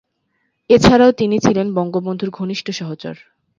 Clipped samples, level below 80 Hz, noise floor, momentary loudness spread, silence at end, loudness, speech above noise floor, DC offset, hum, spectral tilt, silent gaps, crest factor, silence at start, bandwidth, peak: under 0.1%; -42 dBFS; -68 dBFS; 16 LU; 0.45 s; -15 LUFS; 53 dB; under 0.1%; none; -6 dB/octave; none; 16 dB; 0.7 s; 7.6 kHz; 0 dBFS